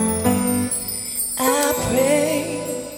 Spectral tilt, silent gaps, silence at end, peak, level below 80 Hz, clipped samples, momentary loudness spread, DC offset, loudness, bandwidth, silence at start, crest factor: -3.5 dB/octave; none; 0 s; -6 dBFS; -44 dBFS; under 0.1%; 6 LU; under 0.1%; -20 LUFS; 17.5 kHz; 0 s; 14 dB